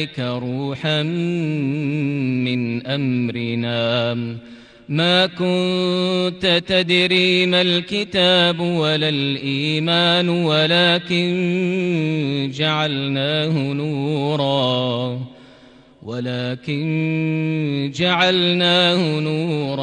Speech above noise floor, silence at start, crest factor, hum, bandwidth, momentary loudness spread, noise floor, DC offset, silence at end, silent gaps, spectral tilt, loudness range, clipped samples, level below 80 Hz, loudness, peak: 28 dB; 0 s; 16 dB; none; 10 kHz; 9 LU; -47 dBFS; under 0.1%; 0 s; none; -6 dB/octave; 6 LU; under 0.1%; -58 dBFS; -18 LUFS; -4 dBFS